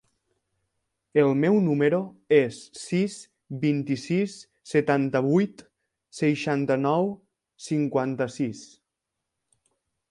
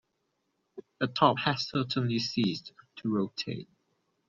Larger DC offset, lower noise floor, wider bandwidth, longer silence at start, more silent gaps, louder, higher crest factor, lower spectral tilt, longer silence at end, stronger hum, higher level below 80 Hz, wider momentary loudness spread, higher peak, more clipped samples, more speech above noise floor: neither; first, -84 dBFS vs -79 dBFS; first, 11.5 kHz vs 7.4 kHz; first, 1.15 s vs 0.75 s; neither; first, -25 LUFS vs -30 LUFS; second, 18 dB vs 24 dB; first, -7 dB/octave vs -4 dB/octave; first, 1.45 s vs 0.65 s; neither; about the same, -70 dBFS vs -70 dBFS; about the same, 15 LU vs 13 LU; about the same, -8 dBFS vs -8 dBFS; neither; first, 60 dB vs 49 dB